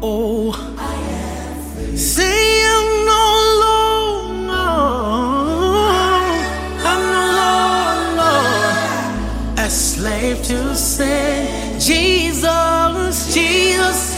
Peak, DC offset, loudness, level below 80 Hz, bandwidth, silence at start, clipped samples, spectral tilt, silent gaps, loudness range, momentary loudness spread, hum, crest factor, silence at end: -2 dBFS; under 0.1%; -15 LUFS; -28 dBFS; 16.5 kHz; 0 s; under 0.1%; -3 dB/octave; none; 3 LU; 10 LU; none; 14 dB; 0 s